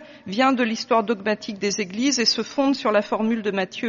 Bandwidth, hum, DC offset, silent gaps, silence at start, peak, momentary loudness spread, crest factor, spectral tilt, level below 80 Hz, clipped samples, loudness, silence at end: 7.2 kHz; none; under 0.1%; none; 0 s; -6 dBFS; 6 LU; 16 dB; -2.5 dB/octave; -66 dBFS; under 0.1%; -22 LUFS; 0 s